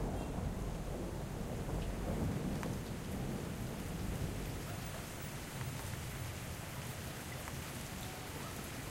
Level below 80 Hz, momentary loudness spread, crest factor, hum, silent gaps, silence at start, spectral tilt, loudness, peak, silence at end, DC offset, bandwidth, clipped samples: -48 dBFS; 5 LU; 18 dB; none; none; 0 s; -5 dB/octave; -42 LUFS; -24 dBFS; 0 s; under 0.1%; 16 kHz; under 0.1%